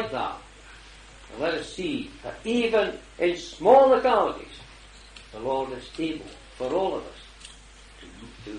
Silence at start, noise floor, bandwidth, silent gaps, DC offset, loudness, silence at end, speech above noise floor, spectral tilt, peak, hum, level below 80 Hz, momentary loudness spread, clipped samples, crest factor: 0 s; -48 dBFS; 10 kHz; none; under 0.1%; -25 LUFS; 0 s; 24 dB; -5 dB/octave; -4 dBFS; none; -52 dBFS; 26 LU; under 0.1%; 22 dB